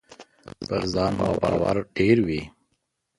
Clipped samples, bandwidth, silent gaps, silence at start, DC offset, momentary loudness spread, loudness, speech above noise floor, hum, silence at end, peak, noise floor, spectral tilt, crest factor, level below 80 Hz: under 0.1%; 11.5 kHz; none; 0.1 s; under 0.1%; 11 LU; -24 LUFS; 52 dB; none; 0.7 s; -6 dBFS; -75 dBFS; -7 dB/octave; 20 dB; -46 dBFS